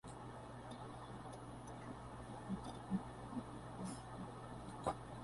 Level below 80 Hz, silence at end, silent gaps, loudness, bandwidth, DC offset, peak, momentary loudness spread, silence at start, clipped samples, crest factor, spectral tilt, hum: -64 dBFS; 0 s; none; -49 LUFS; 11.5 kHz; under 0.1%; -26 dBFS; 7 LU; 0.05 s; under 0.1%; 24 dB; -6 dB/octave; none